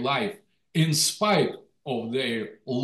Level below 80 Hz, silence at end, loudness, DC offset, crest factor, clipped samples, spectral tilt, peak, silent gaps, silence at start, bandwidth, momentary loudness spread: -72 dBFS; 0 s; -26 LUFS; under 0.1%; 16 dB; under 0.1%; -4 dB/octave; -10 dBFS; none; 0 s; 12.5 kHz; 11 LU